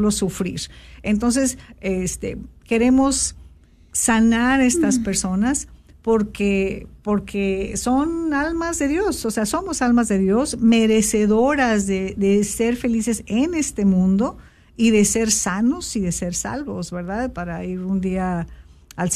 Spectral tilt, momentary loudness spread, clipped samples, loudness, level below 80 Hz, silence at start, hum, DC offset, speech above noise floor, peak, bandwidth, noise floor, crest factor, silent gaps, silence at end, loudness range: -4.5 dB/octave; 11 LU; under 0.1%; -20 LUFS; -40 dBFS; 0 s; none; under 0.1%; 28 dB; -4 dBFS; 14 kHz; -48 dBFS; 16 dB; none; 0 s; 4 LU